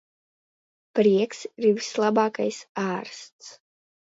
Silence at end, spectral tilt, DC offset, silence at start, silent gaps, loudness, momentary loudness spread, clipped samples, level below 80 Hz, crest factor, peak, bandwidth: 0.65 s; -5 dB/octave; under 0.1%; 0.95 s; 2.69-2.75 s, 3.32-3.39 s; -24 LUFS; 20 LU; under 0.1%; -74 dBFS; 18 dB; -8 dBFS; 8 kHz